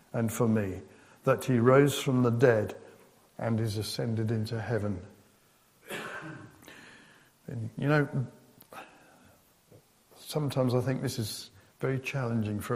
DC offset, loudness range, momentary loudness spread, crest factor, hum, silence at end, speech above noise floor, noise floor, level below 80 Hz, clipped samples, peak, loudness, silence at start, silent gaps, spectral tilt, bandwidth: under 0.1%; 9 LU; 24 LU; 22 dB; none; 0 s; 36 dB; -64 dBFS; -66 dBFS; under 0.1%; -8 dBFS; -29 LUFS; 0.15 s; none; -6.5 dB/octave; 15.5 kHz